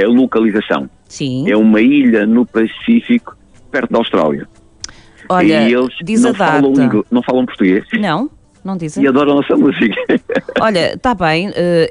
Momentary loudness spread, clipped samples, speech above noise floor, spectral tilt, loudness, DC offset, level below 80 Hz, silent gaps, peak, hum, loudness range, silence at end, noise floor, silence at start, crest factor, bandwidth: 11 LU; under 0.1%; 21 dB; -6 dB/octave; -13 LUFS; under 0.1%; -46 dBFS; none; -2 dBFS; none; 3 LU; 0 s; -34 dBFS; 0 s; 10 dB; 10 kHz